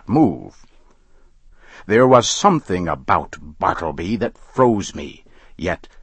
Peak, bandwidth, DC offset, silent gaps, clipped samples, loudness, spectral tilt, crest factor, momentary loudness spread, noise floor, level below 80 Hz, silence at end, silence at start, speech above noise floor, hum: 0 dBFS; 8.8 kHz; under 0.1%; none; under 0.1%; -18 LUFS; -5 dB/octave; 20 dB; 16 LU; -50 dBFS; -44 dBFS; 0.15 s; 0.1 s; 31 dB; none